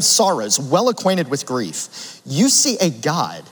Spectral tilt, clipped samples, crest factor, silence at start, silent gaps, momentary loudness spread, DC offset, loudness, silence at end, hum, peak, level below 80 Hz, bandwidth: -3 dB/octave; under 0.1%; 18 dB; 0 s; none; 12 LU; under 0.1%; -17 LUFS; 0.1 s; none; 0 dBFS; -70 dBFS; over 20 kHz